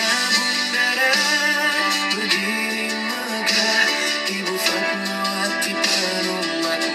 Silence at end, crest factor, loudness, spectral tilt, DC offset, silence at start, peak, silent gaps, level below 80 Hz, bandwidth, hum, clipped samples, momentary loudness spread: 0 s; 18 dB; -19 LUFS; -1.5 dB/octave; under 0.1%; 0 s; -2 dBFS; none; -68 dBFS; 16 kHz; none; under 0.1%; 6 LU